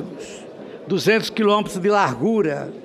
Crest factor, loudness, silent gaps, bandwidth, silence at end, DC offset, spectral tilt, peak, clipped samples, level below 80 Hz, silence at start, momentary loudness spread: 16 dB; -19 LUFS; none; 15 kHz; 0 s; under 0.1%; -5 dB/octave; -4 dBFS; under 0.1%; -60 dBFS; 0 s; 18 LU